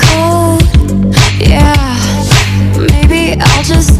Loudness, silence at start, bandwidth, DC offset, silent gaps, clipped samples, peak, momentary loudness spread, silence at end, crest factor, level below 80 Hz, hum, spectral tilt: -8 LUFS; 0 s; 15.5 kHz; under 0.1%; none; 2%; 0 dBFS; 3 LU; 0 s; 8 dB; -12 dBFS; none; -5 dB/octave